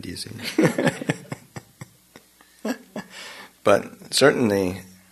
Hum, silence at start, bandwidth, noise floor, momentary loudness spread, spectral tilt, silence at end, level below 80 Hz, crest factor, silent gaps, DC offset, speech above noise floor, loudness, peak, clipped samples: none; 0.05 s; 13.5 kHz; -52 dBFS; 20 LU; -4.5 dB/octave; 0.25 s; -62 dBFS; 24 dB; none; under 0.1%; 31 dB; -23 LUFS; -2 dBFS; under 0.1%